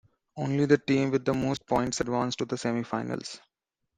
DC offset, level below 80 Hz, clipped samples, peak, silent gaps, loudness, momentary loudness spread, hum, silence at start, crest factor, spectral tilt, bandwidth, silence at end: under 0.1%; -58 dBFS; under 0.1%; -8 dBFS; none; -28 LUFS; 12 LU; none; 0.35 s; 20 dB; -5.5 dB/octave; 9.8 kHz; 0.6 s